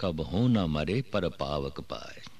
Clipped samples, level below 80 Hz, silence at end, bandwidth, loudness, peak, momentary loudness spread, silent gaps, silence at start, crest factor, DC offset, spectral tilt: under 0.1%; -46 dBFS; 0.1 s; 13 kHz; -30 LUFS; -16 dBFS; 14 LU; none; 0 s; 14 dB; 0.5%; -7.5 dB/octave